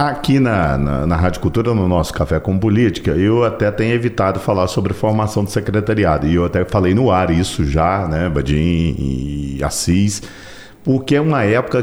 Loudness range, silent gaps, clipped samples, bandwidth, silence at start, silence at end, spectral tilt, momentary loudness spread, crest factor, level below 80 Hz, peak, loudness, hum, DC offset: 2 LU; none; under 0.1%; 19 kHz; 0 s; 0 s; -6.5 dB/octave; 5 LU; 12 dB; -30 dBFS; -4 dBFS; -16 LUFS; none; under 0.1%